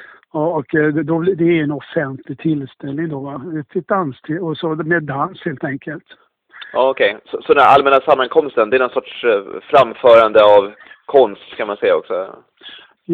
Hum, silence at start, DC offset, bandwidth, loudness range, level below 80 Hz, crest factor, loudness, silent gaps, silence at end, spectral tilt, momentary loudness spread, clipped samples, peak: none; 0 s; under 0.1%; 6.6 kHz; 9 LU; -58 dBFS; 16 dB; -15 LUFS; none; 0 s; -8 dB/octave; 16 LU; under 0.1%; 0 dBFS